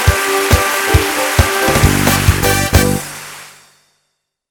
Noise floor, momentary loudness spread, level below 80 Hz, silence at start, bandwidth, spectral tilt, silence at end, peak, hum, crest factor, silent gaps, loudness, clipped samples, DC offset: -69 dBFS; 13 LU; -22 dBFS; 0 s; 19.5 kHz; -4 dB/octave; 1 s; 0 dBFS; none; 14 dB; none; -12 LUFS; 0.1%; under 0.1%